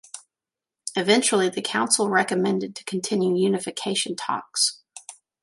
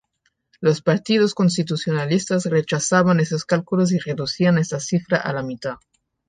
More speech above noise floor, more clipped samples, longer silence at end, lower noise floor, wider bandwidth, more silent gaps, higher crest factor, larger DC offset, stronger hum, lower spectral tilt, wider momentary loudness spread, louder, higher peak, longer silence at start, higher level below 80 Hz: first, 66 dB vs 50 dB; neither; second, 0.3 s vs 0.55 s; first, -89 dBFS vs -70 dBFS; first, 11.5 kHz vs 9.6 kHz; neither; about the same, 20 dB vs 18 dB; neither; neither; second, -3 dB/octave vs -5.5 dB/octave; first, 18 LU vs 8 LU; second, -23 LUFS vs -20 LUFS; about the same, -4 dBFS vs -2 dBFS; second, 0.15 s vs 0.6 s; second, -74 dBFS vs -58 dBFS